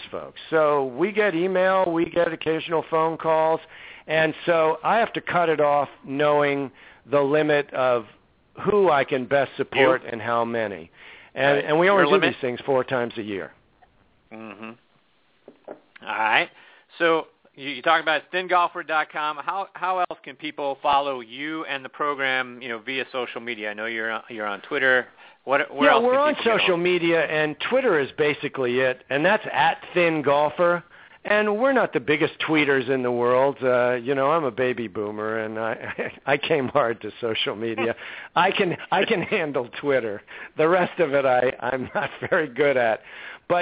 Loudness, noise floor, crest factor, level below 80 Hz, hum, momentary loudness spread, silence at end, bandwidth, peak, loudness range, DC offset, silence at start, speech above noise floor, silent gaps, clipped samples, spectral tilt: -22 LUFS; -64 dBFS; 20 dB; -64 dBFS; none; 11 LU; 0 s; 4 kHz; -4 dBFS; 5 LU; under 0.1%; 0 s; 41 dB; none; under 0.1%; -8.5 dB/octave